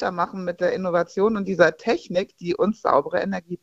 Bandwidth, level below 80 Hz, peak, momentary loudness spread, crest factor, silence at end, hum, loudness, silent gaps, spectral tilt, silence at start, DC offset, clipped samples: 7.8 kHz; -58 dBFS; -2 dBFS; 7 LU; 20 dB; 0.05 s; none; -23 LUFS; none; -6.5 dB/octave; 0 s; under 0.1%; under 0.1%